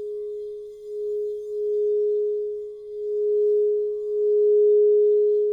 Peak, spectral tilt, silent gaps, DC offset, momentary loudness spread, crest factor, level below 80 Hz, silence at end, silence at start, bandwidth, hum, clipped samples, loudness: -14 dBFS; -7.5 dB/octave; none; under 0.1%; 16 LU; 8 dB; -68 dBFS; 0 s; 0 s; 1.1 kHz; none; under 0.1%; -22 LUFS